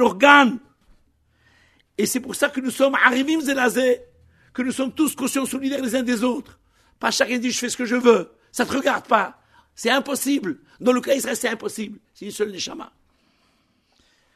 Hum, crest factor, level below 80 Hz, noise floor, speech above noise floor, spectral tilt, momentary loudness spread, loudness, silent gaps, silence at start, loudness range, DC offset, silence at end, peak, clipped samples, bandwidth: none; 22 dB; -62 dBFS; -64 dBFS; 43 dB; -3 dB/octave; 14 LU; -21 LUFS; none; 0 s; 4 LU; under 0.1%; 1.5 s; 0 dBFS; under 0.1%; 13.5 kHz